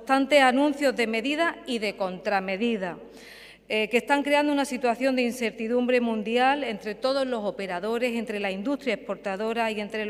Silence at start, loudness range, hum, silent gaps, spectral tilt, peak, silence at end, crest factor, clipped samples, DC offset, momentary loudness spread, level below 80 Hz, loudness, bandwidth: 0 s; 3 LU; 50 Hz at -65 dBFS; none; -4 dB/octave; -6 dBFS; 0 s; 20 dB; under 0.1%; under 0.1%; 9 LU; -64 dBFS; -25 LUFS; 16 kHz